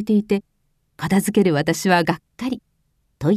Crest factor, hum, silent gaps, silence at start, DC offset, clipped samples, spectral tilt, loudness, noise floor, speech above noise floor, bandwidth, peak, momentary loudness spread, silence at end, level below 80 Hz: 18 dB; none; none; 0 s; under 0.1%; under 0.1%; -5.5 dB/octave; -20 LUFS; -67 dBFS; 47 dB; 14 kHz; -4 dBFS; 10 LU; 0 s; -54 dBFS